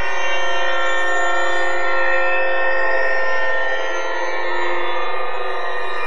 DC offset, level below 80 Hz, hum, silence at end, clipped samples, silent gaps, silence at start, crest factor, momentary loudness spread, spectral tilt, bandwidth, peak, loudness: 20%; -56 dBFS; none; 0 s; under 0.1%; none; 0 s; 12 dB; 6 LU; -3 dB/octave; 11 kHz; -6 dBFS; -20 LUFS